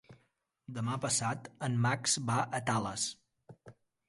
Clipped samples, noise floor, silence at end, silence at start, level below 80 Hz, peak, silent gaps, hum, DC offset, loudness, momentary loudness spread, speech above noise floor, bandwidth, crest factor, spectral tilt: under 0.1%; -76 dBFS; 0.35 s; 0.1 s; -68 dBFS; -16 dBFS; none; none; under 0.1%; -33 LUFS; 8 LU; 43 dB; 11.5 kHz; 18 dB; -3.5 dB/octave